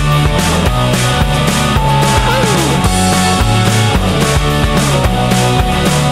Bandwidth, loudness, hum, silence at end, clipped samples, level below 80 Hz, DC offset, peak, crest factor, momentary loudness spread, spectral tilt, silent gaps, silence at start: 16 kHz; -11 LUFS; none; 0 s; under 0.1%; -20 dBFS; under 0.1%; 0 dBFS; 10 dB; 1 LU; -4.5 dB/octave; none; 0 s